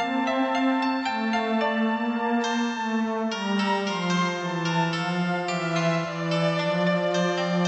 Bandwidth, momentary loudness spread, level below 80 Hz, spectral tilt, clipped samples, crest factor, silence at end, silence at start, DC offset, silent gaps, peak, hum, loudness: 8.4 kHz; 3 LU; -68 dBFS; -5.5 dB/octave; under 0.1%; 14 dB; 0 s; 0 s; under 0.1%; none; -12 dBFS; none; -25 LUFS